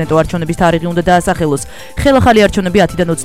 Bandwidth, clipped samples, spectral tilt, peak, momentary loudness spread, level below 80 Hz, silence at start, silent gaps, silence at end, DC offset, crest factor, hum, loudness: 16 kHz; 0.2%; -5.5 dB/octave; 0 dBFS; 8 LU; -28 dBFS; 0 s; none; 0 s; 2%; 12 dB; none; -12 LUFS